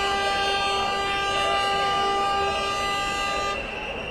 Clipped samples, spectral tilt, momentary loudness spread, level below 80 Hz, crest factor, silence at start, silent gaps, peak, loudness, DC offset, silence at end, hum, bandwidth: under 0.1%; -2 dB/octave; 4 LU; -44 dBFS; 14 dB; 0 s; none; -12 dBFS; -24 LUFS; under 0.1%; 0 s; none; 14.5 kHz